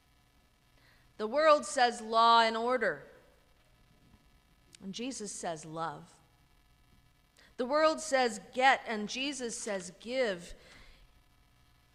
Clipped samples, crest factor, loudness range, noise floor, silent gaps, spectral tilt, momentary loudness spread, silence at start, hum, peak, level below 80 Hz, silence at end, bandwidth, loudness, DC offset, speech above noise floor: under 0.1%; 22 dB; 14 LU; -67 dBFS; none; -2.5 dB/octave; 15 LU; 1.2 s; none; -12 dBFS; -66 dBFS; 1.1 s; 13.5 kHz; -30 LUFS; under 0.1%; 36 dB